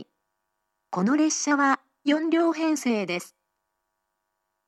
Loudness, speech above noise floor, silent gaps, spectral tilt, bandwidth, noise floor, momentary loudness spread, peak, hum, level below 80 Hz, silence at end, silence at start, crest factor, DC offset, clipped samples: -24 LUFS; 56 dB; none; -4 dB/octave; 13 kHz; -79 dBFS; 7 LU; -10 dBFS; none; -86 dBFS; 1.4 s; 0 s; 16 dB; under 0.1%; under 0.1%